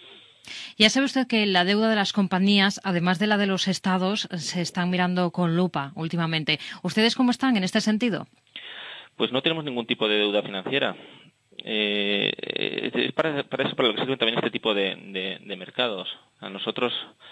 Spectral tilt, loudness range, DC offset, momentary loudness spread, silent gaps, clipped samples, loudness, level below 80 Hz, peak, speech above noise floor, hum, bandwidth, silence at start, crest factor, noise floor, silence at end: -4.5 dB/octave; 4 LU; under 0.1%; 14 LU; none; under 0.1%; -24 LUFS; -70 dBFS; -4 dBFS; 24 dB; none; 11 kHz; 0.05 s; 22 dB; -48 dBFS; 0 s